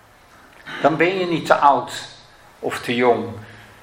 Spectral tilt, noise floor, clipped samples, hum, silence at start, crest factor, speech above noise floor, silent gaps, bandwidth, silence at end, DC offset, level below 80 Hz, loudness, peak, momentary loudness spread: -5 dB/octave; -49 dBFS; under 0.1%; none; 0.65 s; 20 dB; 30 dB; none; 16 kHz; 0.2 s; under 0.1%; -60 dBFS; -19 LUFS; 0 dBFS; 20 LU